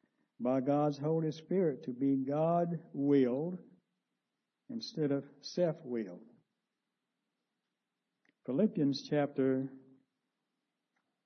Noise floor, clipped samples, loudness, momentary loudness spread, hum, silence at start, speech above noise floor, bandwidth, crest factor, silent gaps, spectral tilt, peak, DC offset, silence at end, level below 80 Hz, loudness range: -88 dBFS; under 0.1%; -34 LUFS; 11 LU; none; 0.4 s; 55 dB; 6.4 kHz; 18 dB; none; -7 dB/octave; -18 dBFS; under 0.1%; 1.45 s; -86 dBFS; 7 LU